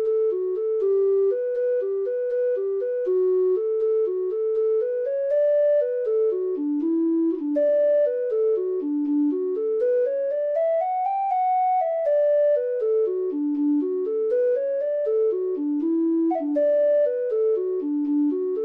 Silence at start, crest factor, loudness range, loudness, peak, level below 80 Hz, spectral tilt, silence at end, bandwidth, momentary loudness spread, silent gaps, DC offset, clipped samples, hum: 0 s; 8 dB; 1 LU; -23 LUFS; -14 dBFS; -74 dBFS; -8 dB/octave; 0 s; 3.9 kHz; 5 LU; none; under 0.1%; under 0.1%; none